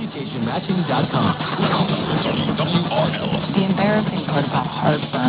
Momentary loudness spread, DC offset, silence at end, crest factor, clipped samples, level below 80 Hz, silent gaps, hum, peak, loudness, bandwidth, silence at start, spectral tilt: 4 LU; under 0.1%; 0 s; 16 dB; under 0.1%; -46 dBFS; none; none; -4 dBFS; -20 LUFS; 4 kHz; 0 s; -10.5 dB/octave